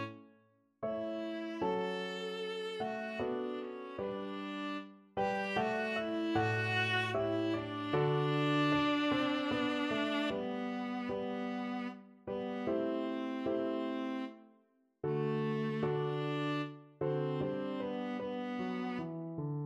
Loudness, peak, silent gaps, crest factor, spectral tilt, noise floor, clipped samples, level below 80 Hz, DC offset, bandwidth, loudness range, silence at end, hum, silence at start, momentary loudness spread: -36 LUFS; -20 dBFS; none; 18 dB; -6.5 dB/octave; -71 dBFS; under 0.1%; -70 dBFS; under 0.1%; 12 kHz; 6 LU; 0 s; none; 0 s; 9 LU